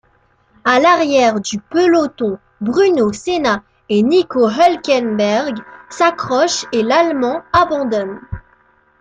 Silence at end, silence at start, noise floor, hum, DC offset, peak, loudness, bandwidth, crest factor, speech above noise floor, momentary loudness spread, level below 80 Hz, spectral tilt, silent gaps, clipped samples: 0.6 s; 0.65 s; -56 dBFS; none; under 0.1%; 0 dBFS; -15 LUFS; 9.4 kHz; 14 dB; 42 dB; 10 LU; -48 dBFS; -4.5 dB/octave; none; under 0.1%